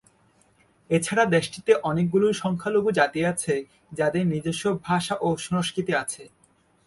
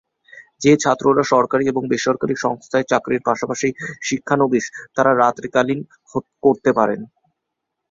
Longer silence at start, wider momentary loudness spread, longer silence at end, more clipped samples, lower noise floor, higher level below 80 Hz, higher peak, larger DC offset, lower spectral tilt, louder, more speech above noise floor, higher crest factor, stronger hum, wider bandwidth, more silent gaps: first, 0.9 s vs 0.35 s; second, 6 LU vs 10 LU; second, 0.6 s vs 0.85 s; neither; second, -62 dBFS vs -79 dBFS; about the same, -60 dBFS vs -58 dBFS; second, -6 dBFS vs -2 dBFS; neither; about the same, -5 dB/octave vs -5 dB/octave; second, -24 LUFS vs -19 LUFS; second, 38 dB vs 61 dB; about the same, 18 dB vs 18 dB; neither; first, 11.5 kHz vs 7.8 kHz; neither